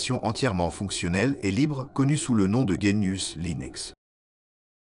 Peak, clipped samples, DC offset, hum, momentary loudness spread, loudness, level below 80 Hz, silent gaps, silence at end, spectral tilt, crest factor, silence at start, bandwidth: -10 dBFS; under 0.1%; under 0.1%; none; 9 LU; -26 LUFS; -50 dBFS; none; 0.9 s; -5.5 dB/octave; 16 dB; 0 s; 11.5 kHz